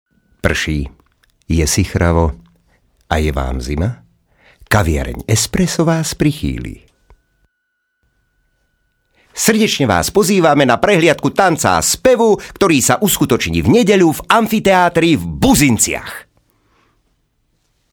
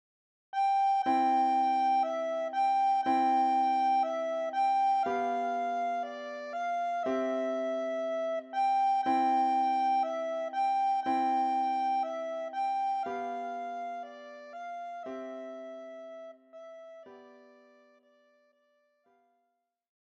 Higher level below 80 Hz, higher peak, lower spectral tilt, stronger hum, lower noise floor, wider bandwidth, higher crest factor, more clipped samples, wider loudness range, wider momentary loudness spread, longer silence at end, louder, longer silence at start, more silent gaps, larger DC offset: first, -30 dBFS vs -86 dBFS; first, 0 dBFS vs -18 dBFS; about the same, -4.5 dB/octave vs -4 dB/octave; neither; second, -70 dBFS vs -80 dBFS; first, over 20 kHz vs 8.4 kHz; about the same, 16 dB vs 12 dB; neither; second, 8 LU vs 16 LU; second, 10 LU vs 17 LU; second, 1.7 s vs 2.7 s; first, -14 LUFS vs -30 LUFS; about the same, 0.45 s vs 0.55 s; neither; neither